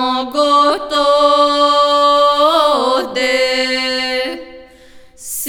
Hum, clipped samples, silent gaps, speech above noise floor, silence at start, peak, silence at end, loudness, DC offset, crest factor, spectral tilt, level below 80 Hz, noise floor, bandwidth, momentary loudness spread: none; under 0.1%; none; 28 dB; 0 s; 0 dBFS; 0 s; -13 LUFS; under 0.1%; 14 dB; -1 dB/octave; -48 dBFS; -41 dBFS; 19.5 kHz; 8 LU